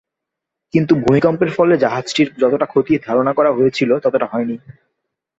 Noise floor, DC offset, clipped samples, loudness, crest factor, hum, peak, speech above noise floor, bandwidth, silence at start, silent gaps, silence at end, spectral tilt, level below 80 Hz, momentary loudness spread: -81 dBFS; under 0.1%; under 0.1%; -16 LUFS; 14 dB; none; -2 dBFS; 66 dB; 8 kHz; 0.75 s; none; 0.85 s; -6.5 dB/octave; -52 dBFS; 6 LU